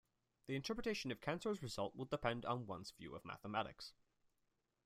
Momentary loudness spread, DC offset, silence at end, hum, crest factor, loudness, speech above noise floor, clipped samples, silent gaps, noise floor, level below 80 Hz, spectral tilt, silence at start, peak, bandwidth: 11 LU; under 0.1%; 0.95 s; none; 22 dB; -45 LUFS; 41 dB; under 0.1%; none; -86 dBFS; -68 dBFS; -5 dB/octave; 0.45 s; -24 dBFS; 15.5 kHz